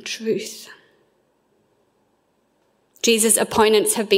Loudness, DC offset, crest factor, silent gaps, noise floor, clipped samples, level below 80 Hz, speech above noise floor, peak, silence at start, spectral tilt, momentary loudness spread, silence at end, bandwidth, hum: -18 LUFS; under 0.1%; 20 dB; none; -65 dBFS; under 0.1%; -60 dBFS; 47 dB; -2 dBFS; 0.05 s; -2 dB/octave; 14 LU; 0 s; 16 kHz; none